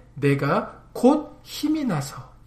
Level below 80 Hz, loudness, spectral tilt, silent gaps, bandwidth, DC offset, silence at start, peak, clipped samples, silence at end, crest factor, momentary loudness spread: -52 dBFS; -23 LUFS; -6.5 dB/octave; none; 15.5 kHz; under 0.1%; 0.15 s; -6 dBFS; under 0.1%; 0.2 s; 18 dB; 15 LU